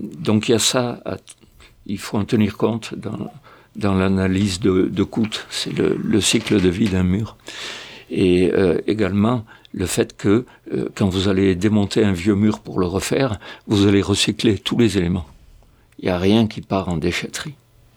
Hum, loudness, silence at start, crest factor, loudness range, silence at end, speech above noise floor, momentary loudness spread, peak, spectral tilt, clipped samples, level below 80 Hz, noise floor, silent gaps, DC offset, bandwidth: none; -19 LUFS; 0 s; 16 dB; 3 LU; 0.4 s; 31 dB; 13 LU; -2 dBFS; -5.5 dB/octave; under 0.1%; -46 dBFS; -50 dBFS; none; under 0.1%; 18.5 kHz